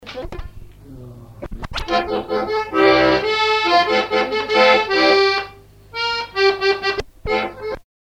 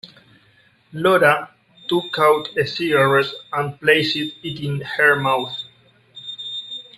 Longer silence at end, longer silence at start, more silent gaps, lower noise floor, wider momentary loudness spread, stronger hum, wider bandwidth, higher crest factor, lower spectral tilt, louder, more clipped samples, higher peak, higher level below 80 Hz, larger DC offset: first, 0.4 s vs 0.15 s; about the same, 0 s vs 0.05 s; neither; second, -41 dBFS vs -56 dBFS; about the same, 19 LU vs 17 LU; first, 50 Hz at -50 dBFS vs none; second, 14 kHz vs 15.5 kHz; about the same, 18 dB vs 20 dB; about the same, -4 dB/octave vs -5 dB/octave; about the same, -17 LUFS vs -19 LUFS; neither; about the same, 0 dBFS vs 0 dBFS; first, -40 dBFS vs -62 dBFS; neither